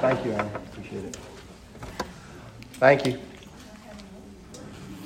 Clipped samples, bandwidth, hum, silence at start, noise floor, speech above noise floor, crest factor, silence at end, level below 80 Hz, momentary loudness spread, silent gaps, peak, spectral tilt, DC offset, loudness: under 0.1%; 16 kHz; none; 0 s; -45 dBFS; 21 dB; 26 dB; 0 s; -52 dBFS; 25 LU; none; -4 dBFS; -5.5 dB/octave; under 0.1%; -26 LUFS